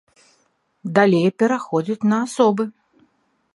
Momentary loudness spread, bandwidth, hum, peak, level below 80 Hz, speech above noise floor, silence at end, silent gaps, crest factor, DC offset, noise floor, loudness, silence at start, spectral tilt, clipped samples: 9 LU; 11.5 kHz; none; 0 dBFS; -70 dBFS; 47 dB; 0.85 s; none; 20 dB; under 0.1%; -65 dBFS; -19 LUFS; 0.85 s; -6.5 dB/octave; under 0.1%